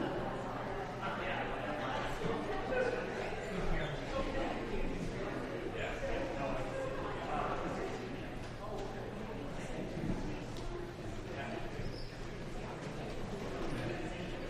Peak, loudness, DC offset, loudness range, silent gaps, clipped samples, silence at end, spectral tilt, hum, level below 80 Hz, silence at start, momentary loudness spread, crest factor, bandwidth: -22 dBFS; -40 LUFS; under 0.1%; 5 LU; none; under 0.1%; 0 s; -6 dB/octave; none; -46 dBFS; 0 s; 6 LU; 16 dB; 13 kHz